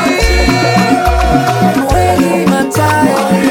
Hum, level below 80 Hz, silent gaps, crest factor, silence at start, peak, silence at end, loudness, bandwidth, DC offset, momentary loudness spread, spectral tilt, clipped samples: none; -20 dBFS; none; 10 dB; 0 s; 0 dBFS; 0 s; -10 LUFS; 18.5 kHz; under 0.1%; 1 LU; -5.5 dB/octave; under 0.1%